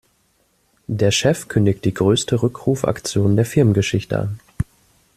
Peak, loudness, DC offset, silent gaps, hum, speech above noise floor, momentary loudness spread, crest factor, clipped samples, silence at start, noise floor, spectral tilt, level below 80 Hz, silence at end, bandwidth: -2 dBFS; -19 LUFS; under 0.1%; none; none; 45 dB; 12 LU; 16 dB; under 0.1%; 0.9 s; -62 dBFS; -5.5 dB/octave; -44 dBFS; 0.55 s; 14 kHz